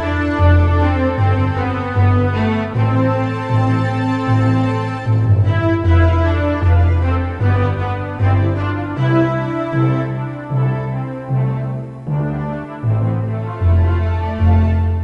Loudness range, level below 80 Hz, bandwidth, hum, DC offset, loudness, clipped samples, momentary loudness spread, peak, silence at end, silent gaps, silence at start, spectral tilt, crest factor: 5 LU; -32 dBFS; 5.6 kHz; none; under 0.1%; -17 LUFS; under 0.1%; 8 LU; -2 dBFS; 0 s; none; 0 s; -9 dB/octave; 14 dB